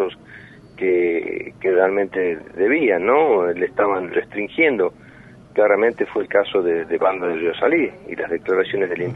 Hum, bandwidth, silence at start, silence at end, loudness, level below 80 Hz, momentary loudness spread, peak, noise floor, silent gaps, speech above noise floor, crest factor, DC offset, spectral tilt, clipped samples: none; 4.5 kHz; 0 s; 0 s; -19 LUFS; -58 dBFS; 8 LU; -4 dBFS; -44 dBFS; none; 25 dB; 16 dB; under 0.1%; -7.5 dB/octave; under 0.1%